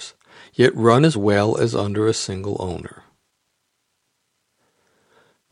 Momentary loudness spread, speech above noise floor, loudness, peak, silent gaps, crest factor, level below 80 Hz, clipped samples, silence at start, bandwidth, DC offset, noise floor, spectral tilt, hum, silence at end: 19 LU; 54 dB; -19 LUFS; 0 dBFS; none; 22 dB; -56 dBFS; under 0.1%; 0 s; 11.5 kHz; under 0.1%; -72 dBFS; -6 dB/octave; none; 2.65 s